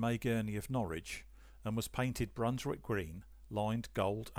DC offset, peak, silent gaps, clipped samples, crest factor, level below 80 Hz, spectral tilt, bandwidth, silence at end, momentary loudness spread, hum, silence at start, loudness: under 0.1%; -22 dBFS; none; under 0.1%; 16 dB; -56 dBFS; -6 dB/octave; over 20 kHz; 0 s; 10 LU; none; 0 s; -38 LUFS